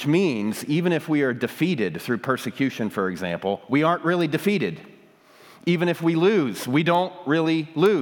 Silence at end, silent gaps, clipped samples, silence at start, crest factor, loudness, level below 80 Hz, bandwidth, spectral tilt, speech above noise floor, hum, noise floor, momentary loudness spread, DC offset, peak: 0 s; none; under 0.1%; 0 s; 16 dB; -23 LUFS; -74 dBFS; 19.5 kHz; -6.5 dB/octave; 30 dB; none; -52 dBFS; 6 LU; under 0.1%; -6 dBFS